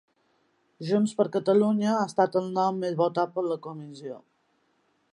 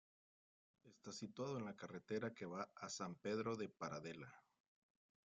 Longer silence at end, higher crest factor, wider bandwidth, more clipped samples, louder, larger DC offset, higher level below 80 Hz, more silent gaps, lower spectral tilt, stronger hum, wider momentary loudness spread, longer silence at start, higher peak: about the same, 0.95 s vs 0.85 s; about the same, 18 dB vs 18 dB; first, 11 kHz vs 9 kHz; neither; first, -26 LUFS vs -49 LUFS; neither; first, -78 dBFS vs -86 dBFS; neither; first, -7 dB/octave vs -5 dB/octave; neither; first, 17 LU vs 10 LU; about the same, 0.8 s vs 0.85 s; first, -8 dBFS vs -32 dBFS